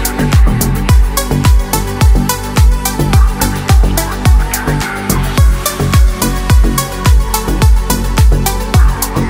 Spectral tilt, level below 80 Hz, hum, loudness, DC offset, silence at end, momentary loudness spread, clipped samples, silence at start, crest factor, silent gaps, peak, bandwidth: -5 dB/octave; -12 dBFS; none; -12 LUFS; under 0.1%; 0 s; 4 LU; under 0.1%; 0 s; 10 dB; none; 0 dBFS; 16.5 kHz